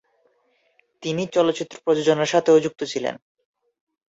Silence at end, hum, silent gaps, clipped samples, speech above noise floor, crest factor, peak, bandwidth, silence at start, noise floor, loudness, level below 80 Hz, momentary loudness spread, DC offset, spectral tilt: 0.95 s; none; none; under 0.1%; 45 dB; 18 dB; -4 dBFS; 8 kHz; 1 s; -66 dBFS; -21 LUFS; -68 dBFS; 12 LU; under 0.1%; -5 dB/octave